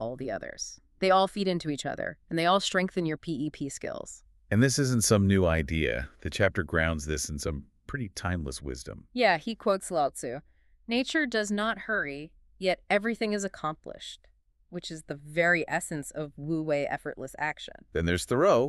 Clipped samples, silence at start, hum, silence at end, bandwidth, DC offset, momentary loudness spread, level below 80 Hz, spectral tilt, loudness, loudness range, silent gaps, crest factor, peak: under 0.1%; 0 s; none; 0 s; 13.5 kHz; under 0.1%; 15 LU; -48 dBFS; -4.5 dB/octave; -29 LUFS; 5 LU; none; 20 dB; -8 dBFS